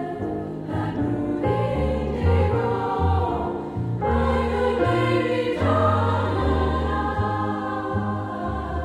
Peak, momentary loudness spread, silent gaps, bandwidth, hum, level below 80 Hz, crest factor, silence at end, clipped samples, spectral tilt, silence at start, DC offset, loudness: -8 dBFS; 8 LU; none; 10 kHz; none; -34 dBFS; 14 dB; 0 s; under 0.1%; -8 dB/octave; 0 s; under 0.1%; -23 LUFS